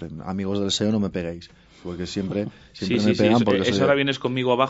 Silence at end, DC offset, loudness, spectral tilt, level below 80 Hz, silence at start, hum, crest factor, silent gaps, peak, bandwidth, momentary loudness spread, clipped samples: 0 s; under 0.1%; -22 LUFS; -5.5 dB/octave; -54 dBFS; 0 s; none; 18 dB; none; -4 dBFS; 8 kHz; 15 LU; under 0.1%